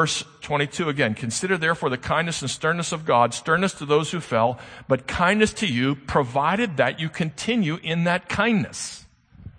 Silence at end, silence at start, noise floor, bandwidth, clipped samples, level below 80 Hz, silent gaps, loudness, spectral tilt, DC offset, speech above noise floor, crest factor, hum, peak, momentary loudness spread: 0.1 s; 0 s; -45 dBFS; 9.8 kHz; under 0.1%; -50 dBFS; none; -23 LUFS; -4.5 dB/octave; under 0.1%; 22 dB; 20 dB; none; -4 dBFS; 7 LU